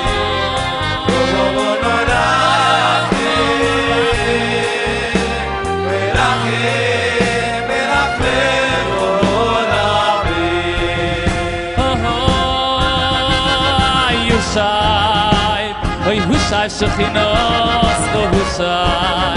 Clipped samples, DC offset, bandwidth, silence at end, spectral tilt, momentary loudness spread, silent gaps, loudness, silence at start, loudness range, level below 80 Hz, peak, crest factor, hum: under 0.1%; under 0.1%; 11 kHz; 0 s; -4.5 dB/octave; 4 LU; none; -15 LUFS; 0 s; 2 LU; -28 dBFS; 0 dBFS; 14 dB; none